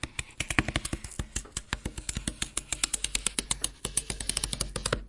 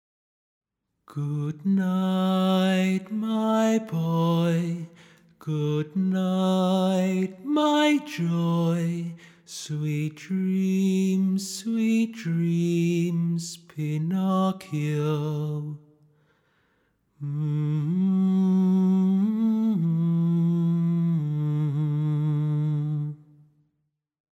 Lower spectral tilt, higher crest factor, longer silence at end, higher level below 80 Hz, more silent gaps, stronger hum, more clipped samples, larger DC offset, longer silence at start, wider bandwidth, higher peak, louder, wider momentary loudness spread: second, -2 dB/octave vs -7 dB/octave; first, 28 dB vs 14 dB; second, 0 s vs 1.2 s; first, -42 dBFS vs -74 dBFS; neither; neither; neither; neither; second, 0.05 s vs 1.1 s; second, 11.5 kHz vs 15 kHz; first, -4 dBFS vs -10 dBFS; second, -31 LUFS vs -25 LUFS; about the same, 8 LU vs 10 LU